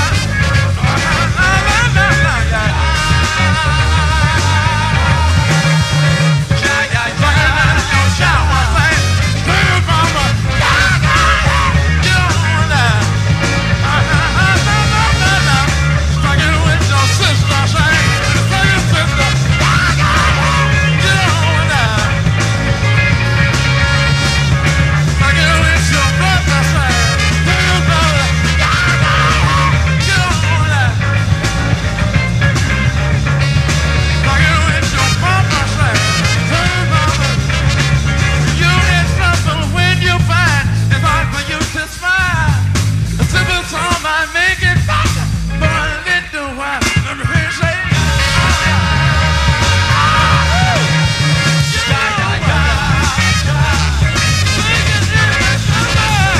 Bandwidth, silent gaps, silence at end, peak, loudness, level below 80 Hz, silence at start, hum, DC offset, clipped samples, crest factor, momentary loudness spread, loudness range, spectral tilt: 14 kHz; none; 0 s; 0 dBFS; -12 LUFS; -20 dBFS; 0 s; none; under 0.1%; under 0.1%; 12 dB; 3 LU; 2 LU; -4.5 dB/octave